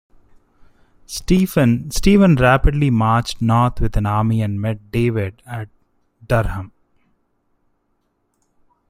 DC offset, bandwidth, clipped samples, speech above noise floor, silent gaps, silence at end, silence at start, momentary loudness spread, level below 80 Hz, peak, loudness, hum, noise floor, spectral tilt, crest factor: under 0.1%; 16 kHz; under 0.1%; 51 dB; none; 2.2 s; 1.1 s; 18 LU; -30 dBFS; -2 dBFS; -17 LUFS; none; -67 dBFS; -6.5 dB/octave; 18 dB